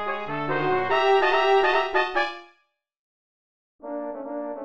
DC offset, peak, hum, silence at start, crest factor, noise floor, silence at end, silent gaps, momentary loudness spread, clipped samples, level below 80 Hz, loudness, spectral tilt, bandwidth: 1%; -8 dBFS; none; 0 s; 18 dB; -69 dBFS; 0 s; 2.99-3.79 s; 14 LU; under 0.1%; -60 dBFS; -23 LUFS; -5.5 dB/octave; 7.8 kHz